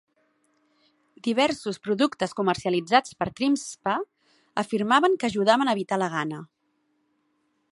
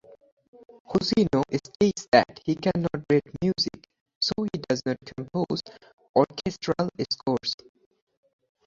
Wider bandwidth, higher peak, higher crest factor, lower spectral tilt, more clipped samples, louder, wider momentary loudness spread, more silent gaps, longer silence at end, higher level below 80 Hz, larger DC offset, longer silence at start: first, 11.5 kHz vs 7.8 kHz; about the same, -4 dBFS vs -4 dBFS; about the same, 22 dB vs 24 dB; about the same, -4.5 dB/octave vs -5.5 dB/octave; neither; about the same, -25 LUFS vs -26 LUFS; about the same, 11 LU vs 9 LU; second, none vs 2.08-2.12 s, 4.01-4.06 s, 4.15-4.21 s, 5.93-5.97 s, 6.09-6.14 s; first, 1.3 s vs 1.1 s; second, -64 dBFS vs -56 dBFS; neither; first, 1.25 s vs 0.9 s